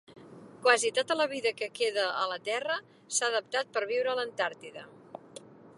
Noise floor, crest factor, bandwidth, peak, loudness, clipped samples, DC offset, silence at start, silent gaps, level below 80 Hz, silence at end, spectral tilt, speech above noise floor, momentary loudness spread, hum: -51 dBFS; 24 dB; 11.5 kHz; -6 dBFS; -30 LUFS; under 0.1%; under 0.1%; 0.1 s; none; -84 dBFS; 0.1 s; -0.5 dB/octave; 21 dB; 22 LU; none